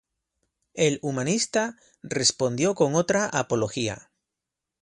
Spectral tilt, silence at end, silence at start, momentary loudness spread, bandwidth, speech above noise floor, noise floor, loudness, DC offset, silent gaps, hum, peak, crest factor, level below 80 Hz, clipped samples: -3.5 dB/octave; 0.8 s; 0.75 s; 10 LU; 11.5 kHz; 61 dB; -86 dBFS; -25 LUFS; under 0.1%; none; none; -6 dBFS; 22 dB; -62 dBFS; under 0.1%